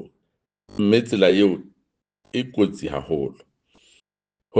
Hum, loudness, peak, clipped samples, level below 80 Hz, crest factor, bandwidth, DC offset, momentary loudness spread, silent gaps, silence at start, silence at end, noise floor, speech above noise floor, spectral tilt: none; -21 LUFS; -2 dBFS; under 0.1%; -56 dBFS; 20 dB; 9.2 kHz; under 0.1%; 14 LU; none; 0 s; 0 s; -87 dBFS; 67 dB; -6.5 dB/octave